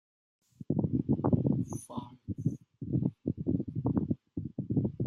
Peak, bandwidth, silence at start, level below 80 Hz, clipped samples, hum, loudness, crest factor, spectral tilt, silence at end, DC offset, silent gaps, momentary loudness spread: -12 dBFS; 12 kHz; 0.6 s; -56 dBFS; under 0.1%; none; -33 LUFS; 20 dB; -10 dB/octave; 0 s; under 0.1%; none; 13 LU